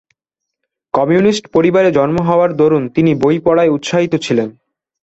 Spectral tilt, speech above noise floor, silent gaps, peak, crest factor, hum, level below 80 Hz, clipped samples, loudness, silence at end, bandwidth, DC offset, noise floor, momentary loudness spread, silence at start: -6.5 dB/octave; 67 dB; none; 0 dBFS; 12 dB; none; -50 dBFS; under 0.1%; -13 LUFS; 0.5 s; 8.2 kHz; under 0.1%; -79 dBFS; 5 LU; 0.95 s